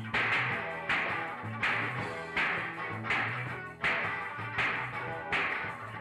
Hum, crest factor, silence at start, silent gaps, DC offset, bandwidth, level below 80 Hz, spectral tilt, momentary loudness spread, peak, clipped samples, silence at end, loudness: none; 14 dB; 0 s; none; under 0.1%; 13 kHz; -64 dBFS; -5 dB/octave; 7 LU; -20 dBFS; under 0.1%; 0 s; -32 LUFS